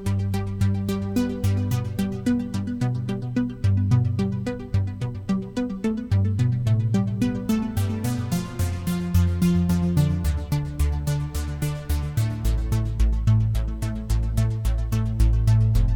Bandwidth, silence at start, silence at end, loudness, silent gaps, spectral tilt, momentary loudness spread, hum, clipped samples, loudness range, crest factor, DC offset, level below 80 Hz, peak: 18.5 kHz; 0 s; 0 s; -24 LUFS; none; -7.5 dB/octave; 6 LU; none; under 0.1%; 2 LU; 14 dB; under 0.1%; -28 dBFS; -8 dBFS